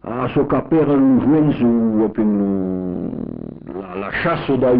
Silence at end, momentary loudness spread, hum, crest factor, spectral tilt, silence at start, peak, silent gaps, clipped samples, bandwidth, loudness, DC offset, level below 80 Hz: 0 s; 15 LU; none; 10 dB; -7 dB/octave; 0.05 s; -8 dBFS; none; under 0.1%; 4.9 kHz; -17 LUFS; under 0.1%; -44 dBFS